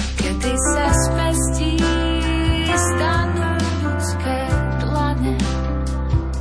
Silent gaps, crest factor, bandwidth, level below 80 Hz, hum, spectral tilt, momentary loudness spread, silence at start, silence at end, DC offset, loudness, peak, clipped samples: none; 14 dB; 11 kHz; -24 dBFS; none; -5 dB/octave; 4 LU; 0 s; 0 s; under 0.1%; -20 LUFS; -4 dBFS; under 0.1%